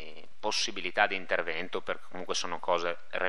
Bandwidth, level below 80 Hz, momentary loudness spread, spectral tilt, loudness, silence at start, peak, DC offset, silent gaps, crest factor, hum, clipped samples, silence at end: 12 kHz; -72 dBFS; 10 LU; -1.5 dB/octave; -31 LUFS; 0 s; -10 dBFS; 2%; none; 24 dB; none; under 0.1%; 0 s